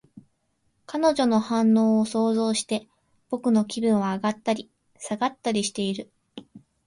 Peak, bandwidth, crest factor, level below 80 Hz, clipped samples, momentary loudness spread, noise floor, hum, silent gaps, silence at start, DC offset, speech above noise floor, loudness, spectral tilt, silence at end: -10 dBFS; 11.5 kHz; 16 dB; -66 dBFS; under 0.1%; 13 LU; -71 dBFS; none; none; 0.15 s; under 0.1%; 48 dB; -24 LUFS; -5 dB/octave; 0.3 s